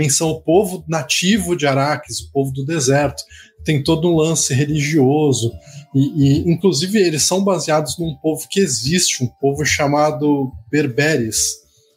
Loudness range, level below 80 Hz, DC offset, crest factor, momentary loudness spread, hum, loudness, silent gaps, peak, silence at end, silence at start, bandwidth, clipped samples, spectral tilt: 2 LU; -44 dBFS; under 0.1%; 16 dB; 7 LU; none; -17 LUFS; none; -2 dBFS; 0.4 s; 0 s; 16 kHz; under 0.1%; -4.5 dB/octave